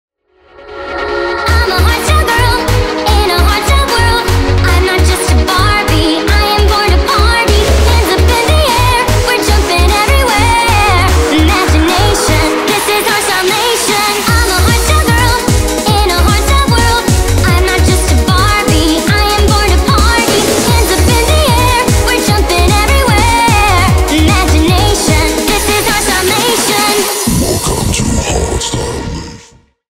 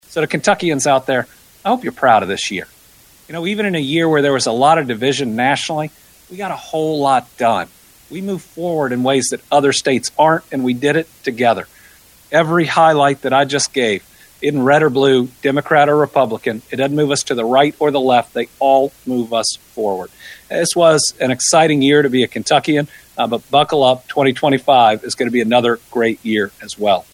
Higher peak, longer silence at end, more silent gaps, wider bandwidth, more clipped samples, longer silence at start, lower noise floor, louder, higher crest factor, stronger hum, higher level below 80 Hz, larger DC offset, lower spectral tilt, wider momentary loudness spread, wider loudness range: about the same, 0 dBFS vs 0 dBFS; first, 0.55 s vs 0.1 s; neither; about the same, 16.5 kHz vs 17 kHz; neither; first, 0.6 s vs 0.1 s; about the same, -45 dBFS vs -47 dBFS; first, -9 LUFS vs -15 LUFS; second, 10 dB vs 16 dB; neither; first, -14 dBFS vs -58 dBFS; neither; about the same, -4 dB/octave vs -4 dB/octave; second, 3 LU vs 11 LU; about the same, 2 LU vs 4 LU